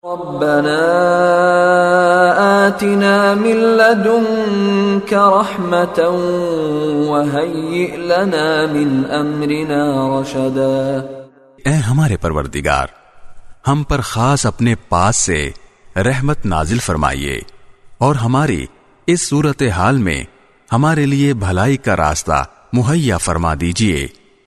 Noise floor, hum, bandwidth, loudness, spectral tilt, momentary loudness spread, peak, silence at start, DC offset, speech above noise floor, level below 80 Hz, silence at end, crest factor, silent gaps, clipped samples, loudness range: -37 dBFS; none; 13.5 kHz; -15 LUFS; -5.5 dB/octave; 8 LU; 0 dBFS; 0.05 s; under 0.1%; 22 dB; -34 dBFS; 0.35 s; 14 dB; none; under 0.1%; 6 LU